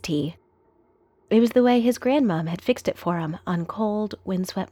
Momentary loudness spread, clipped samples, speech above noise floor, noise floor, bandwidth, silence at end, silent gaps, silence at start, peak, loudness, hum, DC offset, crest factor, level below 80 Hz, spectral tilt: 10 LU; under 0.1%; 39 dB; -62 dBFS; 16 kHz; 0.05 s; none; 0.05 s; -8 dBFS; -23 LUFS; none; under 0.1%; 16 dB; -60 dBFS; -6.5 dB/octave